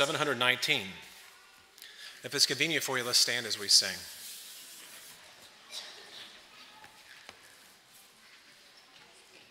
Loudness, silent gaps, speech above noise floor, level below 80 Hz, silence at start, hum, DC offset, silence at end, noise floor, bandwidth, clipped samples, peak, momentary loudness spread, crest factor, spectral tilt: -27 LUFS; none; 29 dB; -80 dBFS; 0 s; none; under 0.1%; 2.2 s; -58 dBFS; 16 kHz; under 0.1%; -8 dBFS; 27 LU; 26 dB; -1 dB/octave